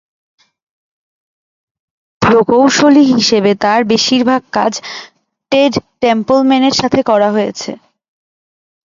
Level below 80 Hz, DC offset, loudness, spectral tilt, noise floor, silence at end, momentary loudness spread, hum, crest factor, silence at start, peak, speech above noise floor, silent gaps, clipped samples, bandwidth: -50 dBFS; under 0.1%; -11 LUFS; -4 dB/octave; under -90 dBFS; 1.15 s; 10 LU; none; 14 dB; 2.2 s; 0 dBFS; over 79 dB; none; under 0.1%; 7.6 kHz